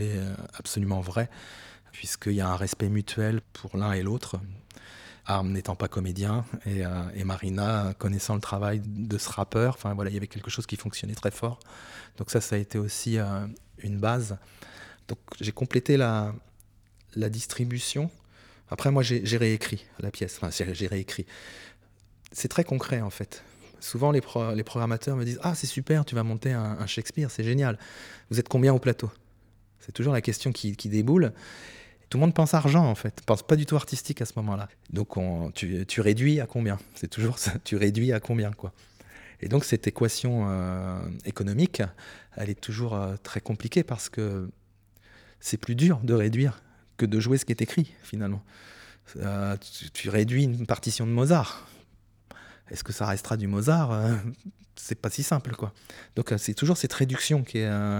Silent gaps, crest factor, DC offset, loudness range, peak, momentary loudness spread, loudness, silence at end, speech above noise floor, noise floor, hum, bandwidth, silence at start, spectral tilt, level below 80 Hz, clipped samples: none; 22 dB; under 0.1%; 5 LU; -6 dBFS; 16 LU; -28 LUFS; 0 s; 32 dB; -59 dBFS; none; 18.5 kHz; 0 s; -6 dB/octave; -56 dBFS; under 0.1%